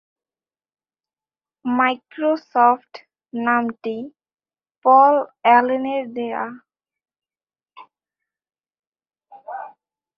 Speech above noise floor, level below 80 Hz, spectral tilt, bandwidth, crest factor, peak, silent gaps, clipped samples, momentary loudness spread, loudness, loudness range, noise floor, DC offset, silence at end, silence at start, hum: over 72 dB; -76 dBFS; -6.5 dB/octave; 5.8 kHz; 20 dB; -2 dBFS; 4.78-4.82 s, 8.79-8.92 s; under 0.1%; 20 LU; -19 LUFS; 12 LU; under -90 dBFS; under 0.1%; 0.5 s; 1.65 s; none